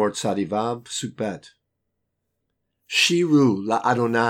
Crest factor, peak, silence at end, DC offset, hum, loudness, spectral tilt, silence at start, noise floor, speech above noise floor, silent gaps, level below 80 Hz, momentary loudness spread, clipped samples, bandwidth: 18 dB; -4 dBFS; 0 s; under 0.1%; none; -22 LUFS; -4.5 dB/octave; 0 s; -77 dBFS; 56 dB; none; -70 dBFS; 12 LU; under 0.1%; 15.5 kHz